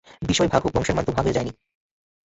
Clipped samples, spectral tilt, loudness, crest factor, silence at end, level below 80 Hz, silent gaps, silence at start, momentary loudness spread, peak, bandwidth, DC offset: under 0.1%; -5 dB/octave; -22 LUFS; 20 dB; 0.75 s; -40 dBFS; none; 0.2 s; 6 LU; -4 dBFS; 8.2 kHz; under 0.1%